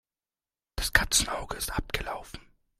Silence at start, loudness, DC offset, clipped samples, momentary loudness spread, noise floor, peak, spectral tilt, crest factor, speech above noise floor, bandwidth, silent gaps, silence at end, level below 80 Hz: 0.75 s; -28 LUFS; under 0.1%; under 0.1%; 20 LU; under -90 dBFS; -2 dBFS; -1.5 dB/octave; 28 dB; over 60 dB; 16 kHz; none; 0.4 s; -40 dBFS